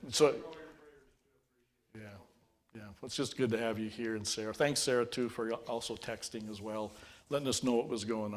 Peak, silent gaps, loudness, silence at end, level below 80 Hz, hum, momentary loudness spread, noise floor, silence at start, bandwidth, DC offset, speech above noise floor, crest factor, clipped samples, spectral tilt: -14 dBFS; none; -35 LUFS; 0 s; -66 dBFS; none; 21 LU; -76 dBFS; 0 s; 16 kHz; under 0.1%; 42 dB; 22 dB; under 0.1%; -3.5 dB/octave